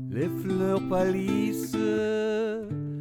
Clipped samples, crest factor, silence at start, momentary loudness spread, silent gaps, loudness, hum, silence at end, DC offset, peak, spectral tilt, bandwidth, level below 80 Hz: under 0.1%; 14 dB; 0 s; 5 LU; none; -27 LUFS; none; 0 s; under 0.1%; -14 dBFS; -7 dB/octave; 20 kHz; -56 dBFS